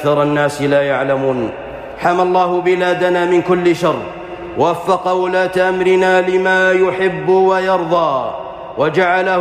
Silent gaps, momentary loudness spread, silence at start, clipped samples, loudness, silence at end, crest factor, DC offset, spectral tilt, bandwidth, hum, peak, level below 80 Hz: none; 11 LU; 0 s; under 0.1%; -14 LUFS; 0 s; 12 dB; under 0.1%; -6 dB/octave; 12.5 kHz; none; -4 dBFS; -48 dBFS